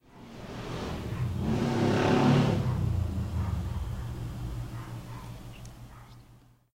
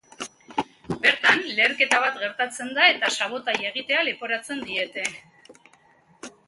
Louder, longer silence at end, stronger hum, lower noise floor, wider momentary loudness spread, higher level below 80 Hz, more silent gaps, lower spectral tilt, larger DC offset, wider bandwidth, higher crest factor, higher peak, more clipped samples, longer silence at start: second, -30 LUFS vs -22 LUFS; first, 0.4 s vs 0.2 s; neither; about the same, -57 dBFS vs -58 dBFS; first, 22 LU vs 13 LU; first, -42 dBFS vs -66 dBFS; neither; first, -7 dB/octave vs -1.5 dB/octave; neither; first, 16 kHz vs 11.5 kHz; second, 18 dB vs 24 dB; second, -12 dBFS vs -2 dBFS; neither; about the same, 0.15 s vs 0.2 s